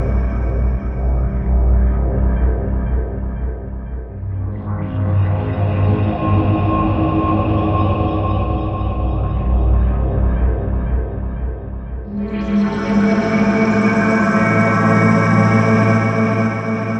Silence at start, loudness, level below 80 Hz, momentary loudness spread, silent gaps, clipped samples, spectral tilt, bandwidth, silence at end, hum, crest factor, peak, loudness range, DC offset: 0 s; -17 LUFS; -22 dBFS; 11 LU; none; under 0.1%; -8.5 dB/octave; 8.2 kHz; 0 s; none; 14 dB; -2 dBFS; 7 LU; under 0.1%